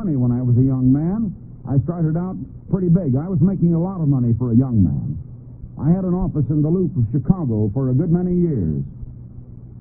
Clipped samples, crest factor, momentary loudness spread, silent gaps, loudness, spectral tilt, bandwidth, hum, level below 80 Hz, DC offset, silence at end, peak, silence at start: under 0.1%; 16 dB; 17 LU; none; -19 LUFS; -17.5 dB/octave; 2.1 kHz; none; -38 dBFS; under 0.1%; 0 s; -2 dBFS; 0 s